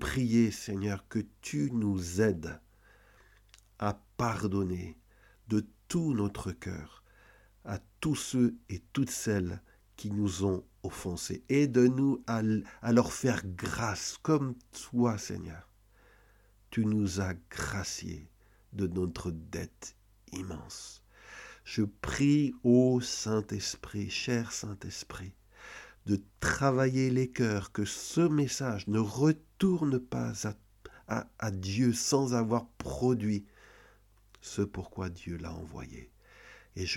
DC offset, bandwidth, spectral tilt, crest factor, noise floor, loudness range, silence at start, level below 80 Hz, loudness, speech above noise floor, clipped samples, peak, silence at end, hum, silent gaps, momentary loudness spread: under 0.1%; 16.5 kHz; -5.5 dB/octave; 20 dB; -63 dBFS; 7 LU; 0 s; -54 dBFS; -32 LUFS; 32 dB; under 0.1%; -12 dBFS; 0 s; none; none; 17 LU